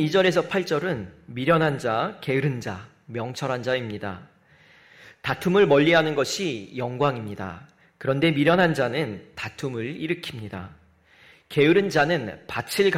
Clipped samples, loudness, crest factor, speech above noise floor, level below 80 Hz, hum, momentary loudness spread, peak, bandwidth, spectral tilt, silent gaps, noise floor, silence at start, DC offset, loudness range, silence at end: under 0.1%; -24 LUFS; 18 dB; 32 dB; -60 dBFS; none; 16 LU; -6 dBFS; 16 kHz; -5.5 dB/octave; none; -55 dBFS; 0 s; under 0.1%; 5 LU; 0 s